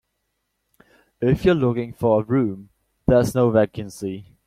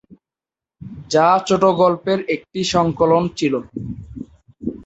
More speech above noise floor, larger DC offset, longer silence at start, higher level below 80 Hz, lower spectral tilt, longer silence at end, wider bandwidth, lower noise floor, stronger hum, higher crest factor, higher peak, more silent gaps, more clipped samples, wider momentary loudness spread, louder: second, 55 dB vs 73 dB; neither; first, 1.2 s vs 0.1 s; about the same, -44 dBFS vs -48 dBFS; first, -7.5 dB/octave vs -5.5 dB/octave; first, 0.25 s vs 0 s; first, 15 kHz vs 8.2 kHz; second, -75 dBFS vs -89 dBFS; neither; about the same, 18 dB vs 18 dB; about the same, -4 dBFS vs -2 dBFS; neither; neither; second, 12 LU vs 21 LU; second, -21 LUFS vs -17 LUFS